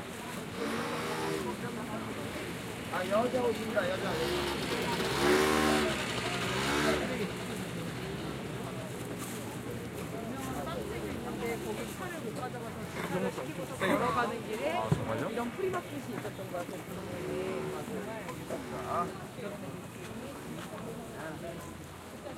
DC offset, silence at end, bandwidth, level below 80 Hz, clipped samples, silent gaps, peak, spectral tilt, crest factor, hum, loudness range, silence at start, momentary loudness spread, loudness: under 0.1%; 0 s; 16 kHz; -56 dBFS; under 0.1%; none; -14 dBFS; -4.5 dB/octave; 20 dB; none; 9 LU; 0 s; 12 LU; -34 LUFS